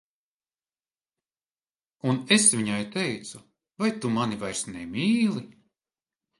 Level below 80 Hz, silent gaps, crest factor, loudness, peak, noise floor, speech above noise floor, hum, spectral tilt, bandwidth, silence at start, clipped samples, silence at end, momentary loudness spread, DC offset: -66 dBFS; none; 22 dB; -25 LUFS; -6 dBFS; under -90 dBFS; over 64 dB; none; -3.5 dB/octave; 11.5 kHz; 2.05 s; under 0.1%; 0.9 s; 14 LU; under 0.1%